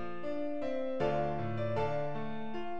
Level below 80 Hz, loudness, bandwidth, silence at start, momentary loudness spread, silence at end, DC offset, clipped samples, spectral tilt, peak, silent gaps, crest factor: -58 dBFS; -36 LUFS; 8 kHz; 0 s; 7 LU; 0 s; 1%; under 0.1%; -8 dB/octave; -20 dBFS; none; 18 dB